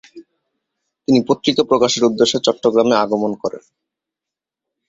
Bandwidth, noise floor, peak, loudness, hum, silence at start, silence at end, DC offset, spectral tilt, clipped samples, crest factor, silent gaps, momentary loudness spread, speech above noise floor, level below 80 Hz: 8 kHz; -86 dBFS; 0 dBFS; -16 LUFS; none; 0.15 s; 1.3 s; under 0.1%; -4.5 dB/octave; under 0.1%; 18 dB; none; 9 LU; 70 dB; -60 dBFS